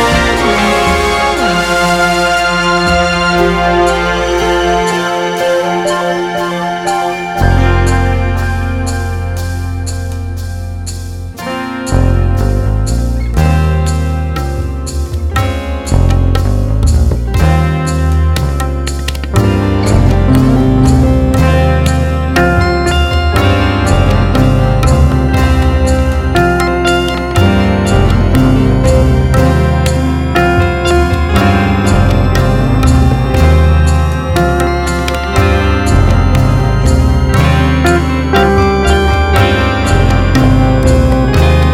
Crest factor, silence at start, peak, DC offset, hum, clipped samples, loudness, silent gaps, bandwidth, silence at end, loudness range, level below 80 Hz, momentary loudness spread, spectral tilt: 10 dB; 0 s; 0 dBFS; under 0.1%; none; under 0.1%; -11 LUFS; none; 15.5 kHz; 0 s; 4 LU; -16 dBFS; 7 LU; -6 dB/octave